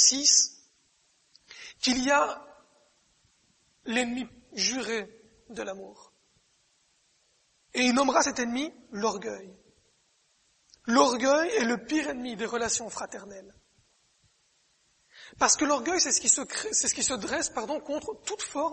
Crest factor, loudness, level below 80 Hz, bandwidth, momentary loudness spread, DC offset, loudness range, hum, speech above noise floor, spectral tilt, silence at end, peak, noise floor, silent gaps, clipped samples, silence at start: 22 dB; -26 LUFS; -64 dBFS; 8.8 kHz; 17 LU; under 0.1%; 8 LU; none; 41 dB; -1 dB/octave; 0 s; -8 dBFS; -69 dBFS; none; under 0.1%; 0 s